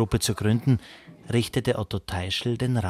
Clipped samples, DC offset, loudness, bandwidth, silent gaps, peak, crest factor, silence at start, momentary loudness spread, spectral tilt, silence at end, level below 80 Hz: under 0.1%; under 0.1%; -26 LUFS; 15.5 kHz; none; -10 dBFS; 14 dB; 0 s; 7 LU; -5.5 dB/octave; 0 s; -44 dBFS